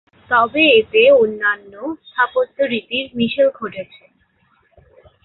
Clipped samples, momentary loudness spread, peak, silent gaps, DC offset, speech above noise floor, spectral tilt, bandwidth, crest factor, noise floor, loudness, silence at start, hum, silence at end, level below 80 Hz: under 0.1%; 17 LU; -2 dBFS; none; under 0.1%; 43 dB; -8.5 dB/octave; 4.2 kHz; 16 dB; -60 dBFS; -15 LUFS; 0.3 s; none; 1.4 s; -58 dBFS